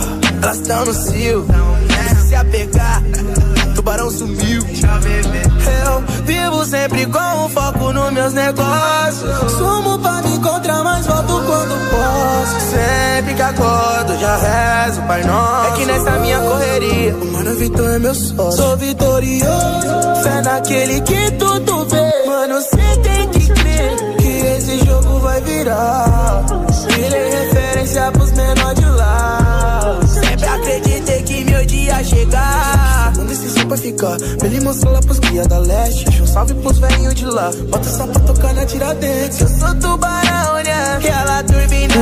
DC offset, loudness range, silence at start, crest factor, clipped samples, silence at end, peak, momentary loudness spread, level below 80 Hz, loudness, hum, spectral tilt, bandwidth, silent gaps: under 0.1%; 1 LU; 0 s; 12 dB; under 0.1%; 0 s; -2 dBFS; 3 LU; -18 dBFS; -14 LUFS; none; -5 dB/octave; 15.5 kHz; none